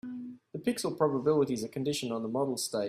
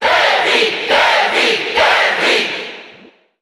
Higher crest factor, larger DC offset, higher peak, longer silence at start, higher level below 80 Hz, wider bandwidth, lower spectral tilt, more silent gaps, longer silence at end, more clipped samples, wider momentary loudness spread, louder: about the same, 18 dB vs 14 dB; neither; second, -14 dBFS vs -2 dBFS; about the same, 0.05 s vs 0 s; second, -70 dBFS vs -52 dBFS; second, 15.5 kHz vs 17.5 kHz; first, -5 dB/octave vs -1 dB/octave; neither; second, 0 s vs 0.5 s; neither; first, 12 LU vs 6 LU; second, -31 LUFS vs -12 LUFS